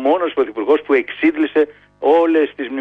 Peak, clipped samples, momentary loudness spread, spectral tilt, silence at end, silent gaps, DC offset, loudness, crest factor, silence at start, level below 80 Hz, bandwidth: -4 dBFS; under 0.1%; 7 LU; -6 dB/octave; 0 s; none; under 0.1%; -17 LUFS; 12 dB; 0 s; -60 dBFS; 4.8 kHz